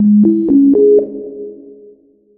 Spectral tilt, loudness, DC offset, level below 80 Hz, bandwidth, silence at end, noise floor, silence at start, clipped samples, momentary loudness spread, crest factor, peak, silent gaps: -15 dB/octave; -10 LUFS; under 0.1%; -54 dBFS; 1.2 kHz; 0.85 s; -45 dBFS; 0 s; under 0.1%; 20 LU; 10 dB; -2 dBFS; none